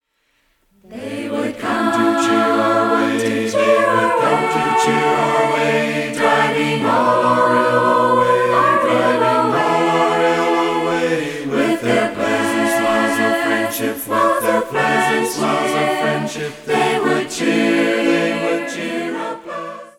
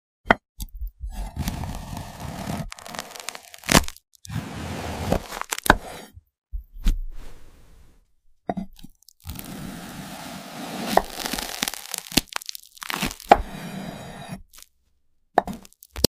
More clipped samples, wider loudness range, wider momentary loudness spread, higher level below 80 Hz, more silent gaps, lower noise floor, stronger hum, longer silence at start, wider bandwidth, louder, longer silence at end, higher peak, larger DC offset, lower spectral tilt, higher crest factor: neither; second, 3 LU vs 12 LU; second, 8 LU vs 20 LU; second, -56 dBFS vs -36 dBFS; second, none vs 0.49-0.55 s; about the same, -64 dBFS vs -64 dBFS; neither; first, 0.9 s vs 0.25 s; about the same, 17 kHz vs 16 kHz; first, -16 LUFS vs -27 LUFS; about the same, 0.1 s vs 0 s; about the same, -2 dBFS vs 0 dBFS; neither; about the same, -4.5 dB/octave vs -3.5 dB/octave; second, 14 dB vs 28 dB